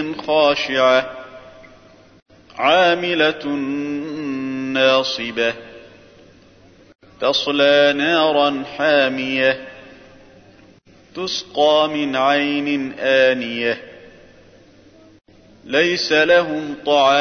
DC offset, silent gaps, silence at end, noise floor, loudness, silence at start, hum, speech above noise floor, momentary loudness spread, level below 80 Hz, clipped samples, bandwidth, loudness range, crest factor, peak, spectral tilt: under 0.1%; 2.22-2.26 s; 0 s; -49 dBFS; -17 LUFS; 0 s; none; 32 dB; 11 LU; -58 dBFS; under 0.1%; 6.6 kHz; 4 LU; 16 dB; -2 dBFS; -4 dB/octave